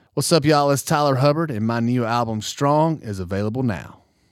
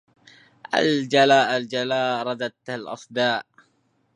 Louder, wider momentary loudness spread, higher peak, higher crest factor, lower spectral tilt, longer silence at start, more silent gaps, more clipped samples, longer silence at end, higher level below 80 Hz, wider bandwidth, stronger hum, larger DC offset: about the same, -20 LUFS vs -22 LUFS; second, 8 LU vs 14 LU; about the same, -4 dBFS vs -2 dBFS; second, 16 dB vs 22 dB; about the same, -5.5 dB/octave vs -4.5 dB/octave; second, 0.15 s vs 0.7 s; neither; neither; second, 0.4 s vs 0.75 s; first, -54 dBFS vs -76 dBFS; first, 16 kHz vs 10.5 kHz; neither; neither